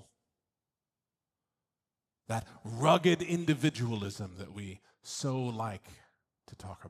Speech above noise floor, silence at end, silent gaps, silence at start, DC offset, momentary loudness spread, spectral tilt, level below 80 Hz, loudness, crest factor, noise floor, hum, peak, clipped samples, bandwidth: over 58 dB; 0 s; none; 2.3 s; under 0.1%; 21 LU; -5.5 dB/octave; -70 dBFS; -32 LUFS; 24 dB; under -90 dBFS; none; -12 dBFS; under 0.1%; 14.5 kHz